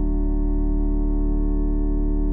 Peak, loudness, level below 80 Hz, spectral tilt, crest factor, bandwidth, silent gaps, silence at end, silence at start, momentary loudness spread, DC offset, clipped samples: -14 dBFS; -25 LUFS; -20 dBFS; -14 dB/octave; 6 dB; 1.9 kHz; none; 0 s; 0 s; 0 LU; under 0.1%; under 0.1%